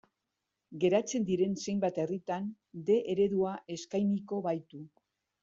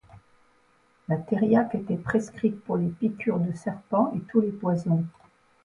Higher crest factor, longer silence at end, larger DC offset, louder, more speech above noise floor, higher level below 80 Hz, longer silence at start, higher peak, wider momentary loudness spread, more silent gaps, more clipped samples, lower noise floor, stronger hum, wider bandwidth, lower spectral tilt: about the same, 18 dB vs 18 dB; about the same, 0.55 s vs 0.55 s; neither; second, -32 LUFS vs -27 LUFS; first, 54 dB vs 38 dB; second, -72 dBFS vs -60 dBFS; first, 0.7 s vs 0.15 s; second, -14 dBFS vs -10 dBFS; first, 11 LU vs 8 LU; neither; neither; first, -86 dBFS vs -63 dBFS; neither; second, 7.8 kHz vs 10.5 kHz; second, -6 dB/octave vs -9 dB/octave